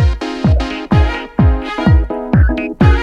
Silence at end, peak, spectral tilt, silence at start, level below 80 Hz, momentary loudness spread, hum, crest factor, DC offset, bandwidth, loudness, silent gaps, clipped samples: 0 s; 0 dBFS; -8 dB/octave; 0 s; -16 dBFS; 3 LU; none; 12 dB; under 0.1%; 7.4 kHz; -14 LUFS; none; under 0.1%